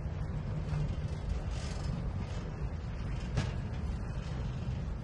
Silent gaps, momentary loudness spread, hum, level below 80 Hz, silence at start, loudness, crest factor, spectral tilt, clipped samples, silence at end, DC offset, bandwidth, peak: none; 4 LU; none; -40 dBFS; 0 s; -38 LUFS; 16 dB; -7 dB/octave; under 0.1%; 0 s; under 0.1%; 10.5 kHz; -20 dBFS